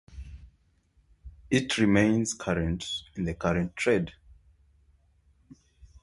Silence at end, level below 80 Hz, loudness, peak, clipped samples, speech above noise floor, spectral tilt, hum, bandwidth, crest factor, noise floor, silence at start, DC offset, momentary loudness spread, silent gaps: 1.9 s; -48 dBFS; -27 LUFS; -8 dBFS; under 0.1%; 39 dB; -5 dB/octave; none; 11.5 kHz; 22 dB; -66 dBFS; 0.1 s; under 0.1%; 15 LU; none